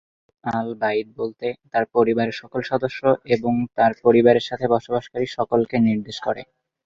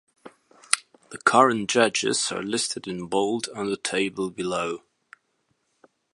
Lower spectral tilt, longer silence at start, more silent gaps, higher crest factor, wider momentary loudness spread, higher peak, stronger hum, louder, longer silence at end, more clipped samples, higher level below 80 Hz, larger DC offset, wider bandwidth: first, -7 dB/octave vs -2.5 dB/octave; first, 0.45 s vs 0.25 s; neither; second, 18 dB vs 26 dB; about the same, 11 LU vs 10 LU; about the same, -2 dBFS vs 0 dBFS; neither; first, -21 LUFS vs -24 LUFS; second, 0.45 s vs 1.35 s; neither; first, -58 dBFS vs -66 dBFS; neither; second, 7.6 kHz vs 11.5 kHz